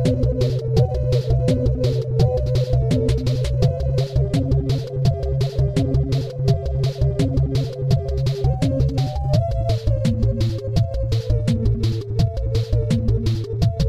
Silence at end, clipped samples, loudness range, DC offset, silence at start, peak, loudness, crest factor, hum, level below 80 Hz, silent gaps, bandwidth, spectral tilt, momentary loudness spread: 0 s; under 0.1%; 1 LU; 0.2%; 0 s; -6 dBFS; -21 LUFS; 14 dB; none; -26 dBFS; none; 11 kHz; -8 dB/octave; 3 LU